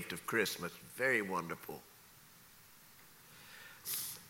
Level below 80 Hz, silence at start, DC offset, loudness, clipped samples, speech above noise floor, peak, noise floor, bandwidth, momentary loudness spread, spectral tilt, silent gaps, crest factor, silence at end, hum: -76 dBFS; 0 s; under 0.1%; -37 LUFS; under 0.1%; 23 dB; -18 dBFS; -61 dBFS; 17 kHz; 25 LU; -3 dB/octave; none; 24 dB; 0 s; none